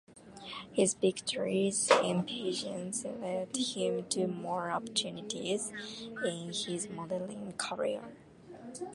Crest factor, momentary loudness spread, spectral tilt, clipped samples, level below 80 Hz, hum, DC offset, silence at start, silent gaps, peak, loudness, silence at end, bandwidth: 24 dB; 14 LU; -3.5 dB/octave; under 0.1%; -72 dBFS; none; under 0.1%; 0.1 s; none; -10 dBFS; -34 LUFS; 0 s; 11.5 kHz